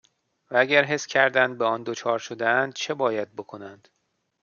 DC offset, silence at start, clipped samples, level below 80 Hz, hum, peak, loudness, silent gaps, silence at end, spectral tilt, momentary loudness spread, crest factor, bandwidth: under 0.1%; 0.5 s; under 0.1%; -76 dBFS; none; -4 dBFS; -23 LUFS; none; 0.65 s; -3.5 dB/octave; 17 LU; 22 dB; 7.2 kHz